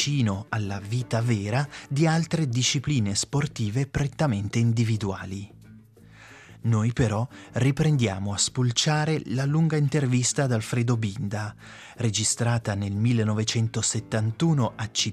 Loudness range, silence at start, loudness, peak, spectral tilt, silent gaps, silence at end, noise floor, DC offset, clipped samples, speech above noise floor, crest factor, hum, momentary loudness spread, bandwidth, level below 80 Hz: 4 LU; 0 s; -25 LUFS; -8 dBFS; -5 dB/octave; none; 0 s; -50 dBFS; under 0.1%; under 0.1%; 25 dB; 16 dB; none; 7 LU; 12.5 kHz; -54 dBFS